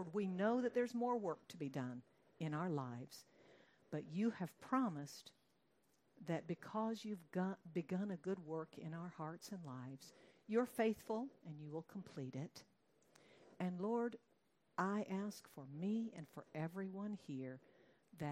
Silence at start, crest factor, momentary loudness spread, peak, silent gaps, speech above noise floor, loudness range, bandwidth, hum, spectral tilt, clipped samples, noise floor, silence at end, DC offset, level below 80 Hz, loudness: 0 s; 20 dB; 15 LU; -26 dBFS; none; 36 dB; 3 LU; 16 kHz; none; -7 dB/octave; under 0.1%; -79 dBFS; 0 s; under 0.1%; -88 dBFS; -45 LUFS